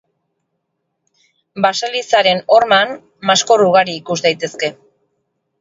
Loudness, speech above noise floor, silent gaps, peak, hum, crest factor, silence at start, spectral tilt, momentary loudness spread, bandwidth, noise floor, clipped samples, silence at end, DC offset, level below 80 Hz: -14 LUFS; 58 dB; none; 0 dBFS; none; 16 dB; 1.55 s; -2.5 dB/octave; 11 LU; 8 kHz; -72 dBFS; under 0.1%; 0.9 s; under 0.1%; -64 dBFS